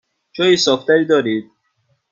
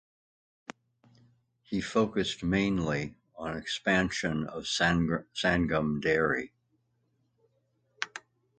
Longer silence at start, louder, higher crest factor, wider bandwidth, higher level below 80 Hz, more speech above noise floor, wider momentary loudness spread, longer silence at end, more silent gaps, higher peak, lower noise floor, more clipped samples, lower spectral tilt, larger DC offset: second, 0.35 s vs 1.7 s; first, -15 LUFS vs -30 LUFS; second, 16 dB vs 22 dB; second, 7.6 kHz vs 9.2 kHz; second, -62 dBFS vs -52 dBFS; first, 50 dB vs 45 dB; second, 10 LU vs 15 LU; first, 0.7 s vs 0.4 s; neither; first, -2 dBFS vs -10 dBFS; second, -65 dBFS vs -74 dBFS; neither; about the same, -4 dB/octave vs -5 dB/octave; neither